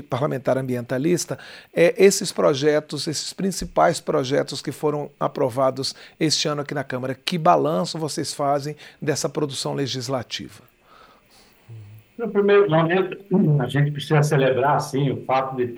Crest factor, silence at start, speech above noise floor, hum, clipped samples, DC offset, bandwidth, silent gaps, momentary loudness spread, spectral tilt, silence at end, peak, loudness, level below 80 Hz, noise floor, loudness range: 20 dB; 0 s; 33 dB; none; under 0.1%; under 0.1%; 16 kHz; none; 10 LU; -5 dB/octave; 0 s; -2 dBFS; -22 LUFS; -56 dBFS; -54 dBFS; 7 LU